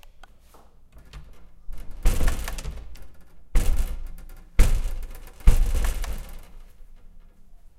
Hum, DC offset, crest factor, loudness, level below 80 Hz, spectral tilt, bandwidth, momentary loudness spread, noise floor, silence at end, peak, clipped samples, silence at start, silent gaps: none; under 0.1%; 22 dB; -29 LUFS; -24 dBFS; -5 dB/octave; 15 kHz; 22 LU; -50 dBFS; 0.2 s; -2 dBFS; under 0.1%; 0.2 s; none